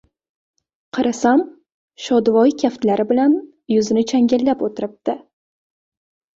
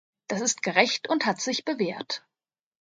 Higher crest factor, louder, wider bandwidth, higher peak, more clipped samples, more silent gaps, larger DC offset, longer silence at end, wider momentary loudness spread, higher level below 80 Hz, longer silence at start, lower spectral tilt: second, 16 dB vs 24 dB; first, -18 LUFS vs -26 LUFS; second, 7.8 kHz vs 10 kHz; about the same, -4 dBFS vs -4 dBFS; neither; first, 1.74-1.88 s vs none; neither; first, 1.2 s vs 0.65 s; about the same, 11 LU vs 11 LU; first, -60 dBFS vs -76 dBFS; first, 0.95 s vs 0.3 s; first, -5.5 dB/octave vs -2.5 dB/octave